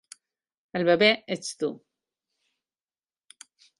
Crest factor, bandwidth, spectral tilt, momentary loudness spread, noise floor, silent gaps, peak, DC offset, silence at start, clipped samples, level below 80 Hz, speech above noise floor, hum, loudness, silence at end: 24 dB; 11.5 kHz; -4 dB/octave; 13 LU; under -90 dBFS; none; -6 dBFS; under 0.1%; 0.75 s; under 0.1%; -72 dBFS; over 66 dB; none; -25 LUFS; 2 s